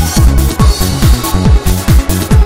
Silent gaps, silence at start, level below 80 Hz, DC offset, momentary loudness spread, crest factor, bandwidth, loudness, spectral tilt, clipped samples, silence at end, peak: none; 0 s; -10 dBFS; 2%; 1 LU; 8 dB; 16.5 kHz; -10 LUFS; -5 dB/octave; under 0.1%; 0 s; 0 dBFS